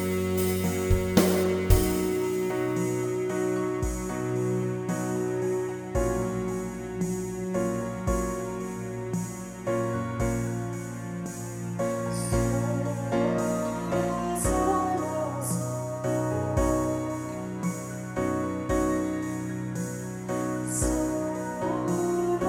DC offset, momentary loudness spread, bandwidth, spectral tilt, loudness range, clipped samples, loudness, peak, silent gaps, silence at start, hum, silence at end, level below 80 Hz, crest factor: under 0.1%; 8 LU; over 20 kHz; -6 dB/octave; 5 LU; under 0.1%; -29 LUFS; -6 dBFS; none; 0 s; none; 0 s; -40 dBFS; 22 dB